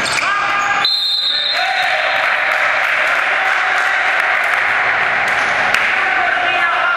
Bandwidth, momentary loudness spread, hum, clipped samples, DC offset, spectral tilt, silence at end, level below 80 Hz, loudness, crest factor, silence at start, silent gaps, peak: 16 kHz; 1 LU; none; under 0.1%; under 0.1%; -0.5 dB/octave; 0 s; -54 dBFS; -13 LUFS; 16 dB; 0 s; none; 0 dBFS